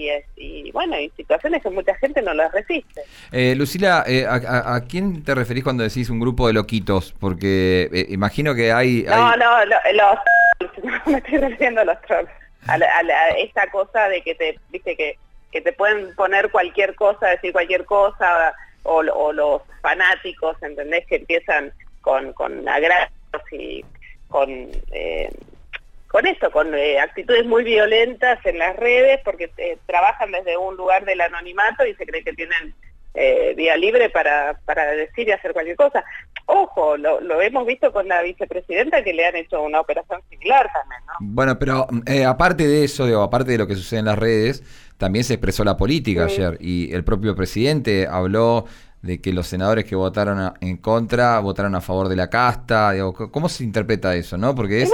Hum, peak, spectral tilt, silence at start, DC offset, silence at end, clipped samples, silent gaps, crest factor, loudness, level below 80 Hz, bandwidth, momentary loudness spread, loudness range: none; -4 dBFS; -6 dB/octave; 0 s; under 0.1%; 0 s; under 0.1%; none; 16 dB; -19 LUFS; -38 dBFS; 17 kHz; 11 LU; 5 LU